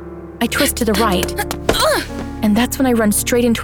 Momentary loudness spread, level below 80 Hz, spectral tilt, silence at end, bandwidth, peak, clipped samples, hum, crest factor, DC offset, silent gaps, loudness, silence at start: 6 LU; -32 dBFS; -4 dB/octave; 0 s; 19.5 kHz; -2 dBFS; under 0.1%; none; 16 dB; under 0.1%; none; -16 LUFS; 0 s